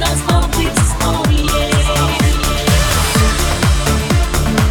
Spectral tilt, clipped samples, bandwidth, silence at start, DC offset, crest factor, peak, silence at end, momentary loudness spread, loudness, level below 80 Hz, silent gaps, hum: -4.5 dB/octave; under 0.1%; 20 kHz; 0 s; under 0.1%; 12 dB; 0 dBFS; 0 s; 2 LU; -14 LUFS; -18 dBFS; none; none